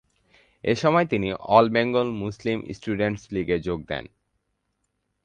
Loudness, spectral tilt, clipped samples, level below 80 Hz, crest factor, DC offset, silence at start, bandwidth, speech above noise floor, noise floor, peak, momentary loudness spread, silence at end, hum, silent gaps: -24 LUFS; -6.5 dB/octave; under 0.1%; -52 dBFS; 22 dB; under 0.1%; 0.65 s; 9.4 kHz; 52 dB; -76 dBFS; -2 dBFS; 12 LU; 1.2 s; none; none